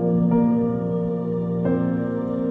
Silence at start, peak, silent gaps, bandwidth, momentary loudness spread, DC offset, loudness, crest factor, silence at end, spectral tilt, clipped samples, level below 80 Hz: 0 s; -10 dBFS; none; 3.5 kHz; 6 LU; under 0.1%; -22 LUFS; 12 dB; 0 s; -12 dB/octave; under 0.1%; -50 dBFS